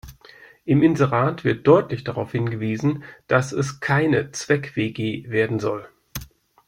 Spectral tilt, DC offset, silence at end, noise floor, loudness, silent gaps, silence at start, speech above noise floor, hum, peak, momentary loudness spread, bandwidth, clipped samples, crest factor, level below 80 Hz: -6.5 dB/octave; under 0.1%; 0.4 s; -48 dBFS; -21 LUFS; none; 0.05 s; 28 dB; none; -2 dBFS; 16 LU; 16 kHz; under 0.1%; 20 dB; -54 dBFS